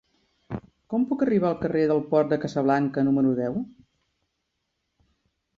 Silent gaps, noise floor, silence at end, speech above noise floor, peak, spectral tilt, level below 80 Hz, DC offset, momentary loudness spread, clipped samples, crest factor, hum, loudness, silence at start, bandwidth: none; -78 dBFS; 1.9 s; 55 dB; -8 dBFS; -8.5 dB/octave; -60 dBFS; under 0.1%; 16 LU; under 0.1%; 18 dB; none; -24 LUFS; 0.5 s; 7.2 kHz